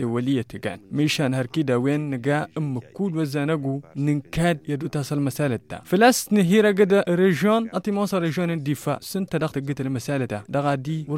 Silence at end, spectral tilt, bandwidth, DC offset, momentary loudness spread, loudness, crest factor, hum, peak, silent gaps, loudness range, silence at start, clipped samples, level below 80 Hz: 0 s; -6 dB/octave; 16.5 kHz; under 0.1%; 10 LU; -23 LUFS; 18 dB; none; -4 dBFS; none; 5 LU; 0 s; under 0.1%; -54 dBFS